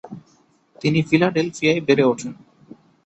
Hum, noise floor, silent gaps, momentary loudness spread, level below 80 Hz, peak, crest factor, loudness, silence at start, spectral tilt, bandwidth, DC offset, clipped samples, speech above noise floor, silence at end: none; -58 dBFS; none; 12 LU; -60 dBFS; -2 dBFS; 18 dB; -19 LUFS; 0.05 s; -6 dB/octave; 8.2 kHz; under 0.1%; under 0.1%; 40 dB; 0.7 s